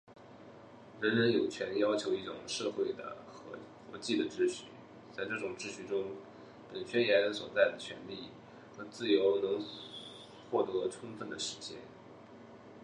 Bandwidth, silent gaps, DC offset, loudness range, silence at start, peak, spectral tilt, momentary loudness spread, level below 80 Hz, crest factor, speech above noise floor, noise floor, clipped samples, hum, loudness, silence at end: 10.5 kHz; none; under 0.1%; 5 LU; 0.1 s; -12 dBFS; -4 dB/octave; 24 LU; -74 dBFS; 24 dB; 20 dB; -54 dBFS; under 0.1%; none; -34 LUFS; 0 s